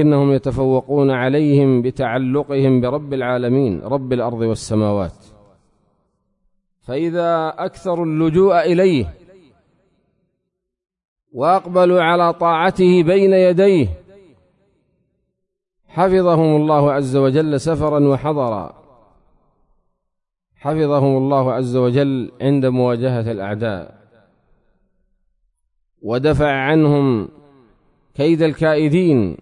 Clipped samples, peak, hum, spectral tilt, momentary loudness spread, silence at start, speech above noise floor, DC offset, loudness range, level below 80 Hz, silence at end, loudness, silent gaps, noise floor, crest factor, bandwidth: under 0.1%; -4 dBFS; none; -8 dB/octave; 10 LU; 0 s; 61 dB; under 0.1%; 7 LU; -46 dBFS; 0.05 s; -16 LUFS; 11.05-11.16 s; -76 dBFS; 14 dB; 11 kHz